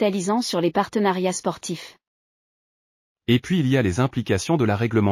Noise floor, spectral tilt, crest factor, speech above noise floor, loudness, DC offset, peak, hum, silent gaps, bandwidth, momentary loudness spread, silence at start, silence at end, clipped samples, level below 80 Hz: under -90 dBFS; -5.5 dB/octave; 16 dB; over 69 dB; -22 LUFS; under 0.1%; -6 dBFS; none; 2.07-3.16 s; 15 kHz; 11 LU; 0 s; 0 s; under 0.1%; -54 dBFS